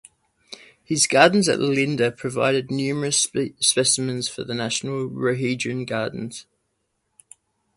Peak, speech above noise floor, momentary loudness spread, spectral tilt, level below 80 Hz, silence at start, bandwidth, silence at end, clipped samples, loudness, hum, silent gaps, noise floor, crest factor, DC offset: 0 dBFS; 52 dB; 17 LU; -3.5 dB/octave; -62 dBFS; 0.5 s; 11.5 kHz; 1.35 s; under 0.1%; -21 LUFS; none; none; -73 dBFS; 22 dB; under 0.1%